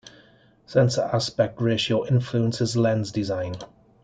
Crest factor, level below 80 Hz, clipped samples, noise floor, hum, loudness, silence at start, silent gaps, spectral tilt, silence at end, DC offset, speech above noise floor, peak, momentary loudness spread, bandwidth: 16 dB; -58 dBFS; under 0.1%; -56 dBFS; none; -24 LUFS; 0.05 s; none; -6 dB/octave; 0.4 s; under 0.1%; 33 dB; -8 dBFS; 6 LU; 9.2 kHz